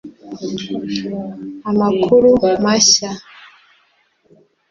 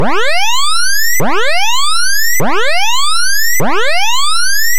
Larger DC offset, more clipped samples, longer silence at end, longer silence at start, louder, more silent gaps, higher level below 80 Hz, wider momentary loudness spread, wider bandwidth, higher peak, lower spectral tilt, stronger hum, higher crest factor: second, under 0.1% vs 40%; neither; first, 1.25 s vs 0 s; about the same, 0.05 s vs 0 s; second, -15 LUFS vs -12 LUFS; neither; about the same, -50 dBFS vs -50 dBFS; first, 18 LU vs 1 LU; second, 7.8 kHz vs 17 kHz; about the same, -2 dBFS vs 0 dBFS; first, -3.5 dB/octave vs -1 dB/octave; neither; first, 16 dB vs 8 dB